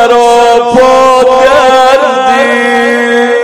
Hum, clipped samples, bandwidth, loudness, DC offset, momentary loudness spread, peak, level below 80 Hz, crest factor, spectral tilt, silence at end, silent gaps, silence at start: none; 10%; 13.5 kHz; -5 LUFS; under 0.1%; 3 LU; 0 dBFS; -38 dBFS; 6 dB; -3 dB/octave; 0 s; none; 0 s